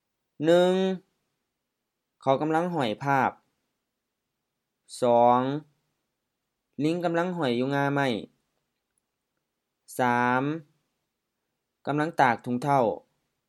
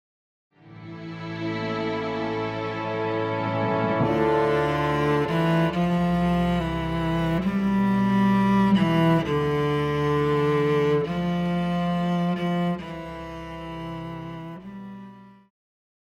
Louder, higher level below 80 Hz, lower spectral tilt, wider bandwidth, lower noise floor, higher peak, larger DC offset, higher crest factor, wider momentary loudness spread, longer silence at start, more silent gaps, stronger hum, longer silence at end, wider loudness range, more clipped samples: about the same, -25 LUFS vs -24 LUFS; second, -78 dBFS vs -46 dBFS; second, -6.5 dB/octave vs -8 dB/octave; first, 13.5 kHz vs 12 kHz; first, -83 dBFS vs -45 dBFS; first, -6 dBFS vs -10 dBFS; neither; first, 22 dB vs 14 dB; about the same, 14 LU vs 15 LU; second, 0.4 s vs 0.65 s; neither; neither; second, 0.5 s vs 0.75 s; second, 4 LU vs 8 LU; neither